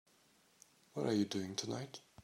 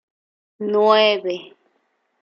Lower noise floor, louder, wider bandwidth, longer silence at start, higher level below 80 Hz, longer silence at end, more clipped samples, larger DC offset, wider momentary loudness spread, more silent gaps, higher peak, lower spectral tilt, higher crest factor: about the same, -71 dBFS vs -68 dBFS; second, -40 LUFS vs -17 LUFS; first, 16 kHz vs 6.8 kHz; first, 0.95 s vs 0.6 s; about the same, -82 dBFS vs -78 dBFS; second, 0 s vs 0.75 s; neither; neither; second, 13 LU vs 16 LU; neither; second, -24 dBFS vs -4 dBFS; about the same, -5 dB/octave vs -5 dB/octave; about the same, 18 dB vs 18 dB